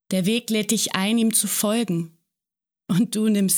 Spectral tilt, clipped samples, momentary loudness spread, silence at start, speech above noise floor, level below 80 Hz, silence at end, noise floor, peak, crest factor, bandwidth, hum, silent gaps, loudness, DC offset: -4 dB/octave; under 0.1%; 7 LU; 0.1 s; 65 dB; -70 dBFS; 0 s; -86 dBFS; -6 dBFS; 16 dB; over 20 kHz; none; none; -21 LUFS; under 0.1%